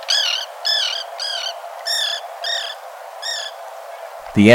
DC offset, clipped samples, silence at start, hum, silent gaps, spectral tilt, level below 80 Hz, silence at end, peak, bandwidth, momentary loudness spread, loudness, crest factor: under 0.1%; under 0.1%; 0 s; none; none; -3.5 dB/octave; -60 dBFS; 0 s; 0 dBFS; 17 kHz; 17 LU; -21 LUFS; 20 dB